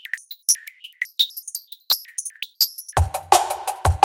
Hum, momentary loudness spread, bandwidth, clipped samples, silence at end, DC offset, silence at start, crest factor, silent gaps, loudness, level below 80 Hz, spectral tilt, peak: none; 13 LU; 17 kHz; under 0.1%; 0 s; under 0.1%; 0.15 s; 24 dB; none; -22 LUFS; -34 dBFS; -2 dB/octave; 0 dBFS